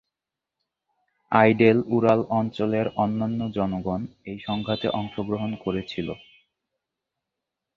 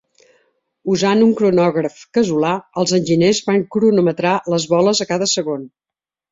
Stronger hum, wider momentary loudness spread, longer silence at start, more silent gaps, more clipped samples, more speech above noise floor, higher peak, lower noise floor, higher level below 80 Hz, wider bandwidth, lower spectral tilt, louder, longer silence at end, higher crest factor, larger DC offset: neither; first, 13 LU vs 7 LU; first, 1.3 s vs 0.85 s; neither; neither; first, 64 dB vs 47 dB; about the same, -2 dBFS vs -2 dBFS; first, -87 dBFS vs -63 dBFS; about the same, -56 dBFS vs -58 dBFS; second, 6.8 kHz vs 7.8 kHz; first, -8.5 dB/octave vs -5 dB/octave; second, -24 LUFS vs -16 LUFS; first, 1.6 s vs 0.65 s; first, 24 dB vs 14 dB; neither